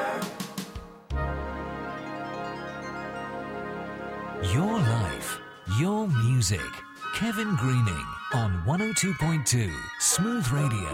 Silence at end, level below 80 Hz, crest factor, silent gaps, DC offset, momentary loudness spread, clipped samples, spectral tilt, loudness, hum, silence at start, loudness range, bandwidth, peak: 0 s; -44 dBFS; 18 dB; none; under 0.1%; 12 LU; under 0.1%; -4.5 dB/octave; -28 LUFS; none; 0 s; 9 LU; 16 kHz; -10 dBFS